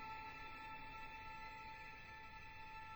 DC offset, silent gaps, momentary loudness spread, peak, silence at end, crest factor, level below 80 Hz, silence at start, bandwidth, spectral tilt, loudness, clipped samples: under 0.1%; none; 4 LU; -40 dBFS; 0 s; 14 dB; -64 dBFS; 0 s; over 20 kHz; -4 dB/octave; -53 LUFS; under 0.1%